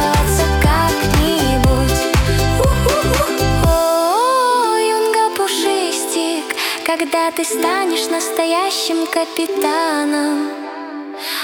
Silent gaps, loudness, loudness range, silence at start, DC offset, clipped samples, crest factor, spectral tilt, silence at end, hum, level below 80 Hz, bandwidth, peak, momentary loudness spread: none; -16 LUFS; 3 LU; 0 s; under 0.1%; under 0.1%; 16 dB; -4.5 dB/octave; 0 s; none; -24 dBFS; 18.5 kHz; 0 dBFS; 5 LU